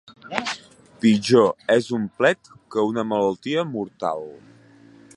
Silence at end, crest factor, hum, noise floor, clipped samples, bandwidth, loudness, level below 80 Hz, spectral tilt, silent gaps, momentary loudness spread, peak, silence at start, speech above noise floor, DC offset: 0.8 s; 20 dB; none; -50 dBFS; under 0.1%; 11.5 kHz; -22 LUFS; -64 dBFS; -5.5 dB/octave; none; 13 LU; -2 dBFS; 0.1 s; 28 dB; under 0.1%